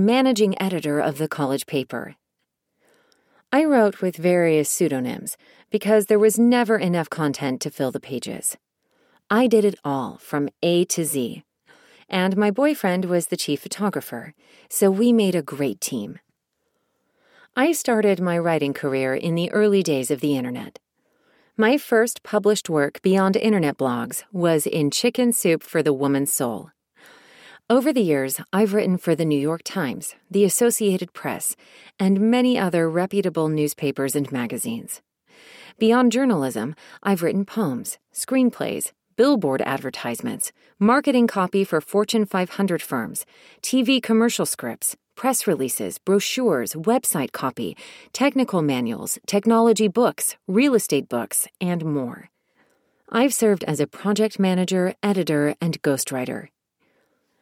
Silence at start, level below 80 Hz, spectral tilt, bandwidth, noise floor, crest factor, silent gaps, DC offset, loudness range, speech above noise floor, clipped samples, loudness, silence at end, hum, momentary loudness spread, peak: 0 s; -70 dBFS; -4.5 dB/octave; 17 kHz; -78 dBFS; 16 dB; none; under 0.1%; 3 LU; 57 dB; under 0.1%; -21 LUFS; 0.95 s; none; 10 LU; -4 dBFS